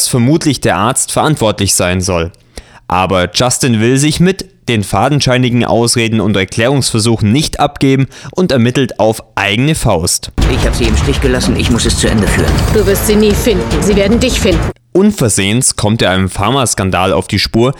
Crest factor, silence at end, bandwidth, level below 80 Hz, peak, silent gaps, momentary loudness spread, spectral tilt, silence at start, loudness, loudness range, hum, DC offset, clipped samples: 10 dB; 0 s; over 20 kHz; -22 dBFS; 0 dBFS; none; 4 LU; -4.5 dB/octave; 0 s; -11 LUFS; 2 LU; none; under 0.1%; under 0.1%